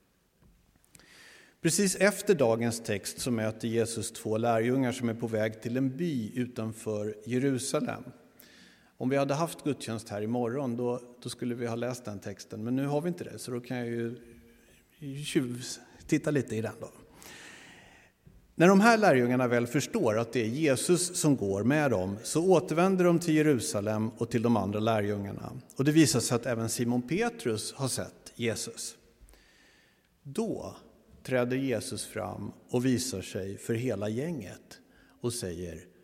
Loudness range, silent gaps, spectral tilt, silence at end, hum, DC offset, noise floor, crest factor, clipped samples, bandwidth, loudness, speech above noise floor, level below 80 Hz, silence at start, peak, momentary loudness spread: 9 LU; none; -5 dB/octave; 0.2 s; none; under 0.1%; -65 dBFS; 22 dB; under 0.1%; 16.5 kHz; -29 LUFS; 36 dB; -66 dBFS; 1.25 s; -8 dBFS; 15 LU